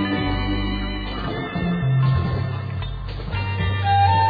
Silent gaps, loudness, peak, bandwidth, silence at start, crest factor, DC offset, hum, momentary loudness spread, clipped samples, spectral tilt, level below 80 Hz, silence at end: none; -23 LUFS; -6 dBFS; 5 kHz; 0 s; 14 dB; under 0.1%; none; 9 LU; under 0.1%; -9 dB/octave; -32 dBFS; 0 s